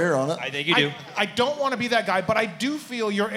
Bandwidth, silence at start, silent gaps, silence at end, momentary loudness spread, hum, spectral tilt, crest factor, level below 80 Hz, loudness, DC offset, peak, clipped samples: 16.5 kHz; 0 s; none; 0 s; 6 LU; none; -4.5 dB/octave; 20 dB; -68 dBFS; -24 LUFS; under 0.1%; -4 dBFS; under 0.1%